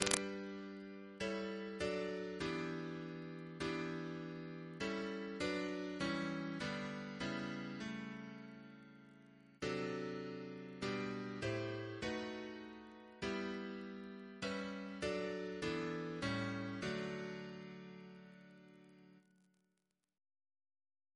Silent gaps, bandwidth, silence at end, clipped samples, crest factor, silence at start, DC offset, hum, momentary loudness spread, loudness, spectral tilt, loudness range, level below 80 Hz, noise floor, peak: none; 11 kHz; 1.95 s; under 0.1%; 36 dB; 0 s; under 0.1%; none; 15 LU; -44 LUFS; -4.5 dB/octave; 5 LU; -70 dBFS; -87 dBFS; -10 dBFS